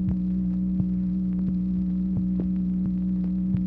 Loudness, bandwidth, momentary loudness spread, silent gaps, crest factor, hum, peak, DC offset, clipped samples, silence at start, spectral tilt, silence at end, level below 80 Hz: -26 LUFS; 1.9 kHz; 0 LU; none; 12 dB; none; -12 dBFS; under 0.1%; under 0.1%; 0 s; -12.5 dB/octave; 0 s; -38 dBFS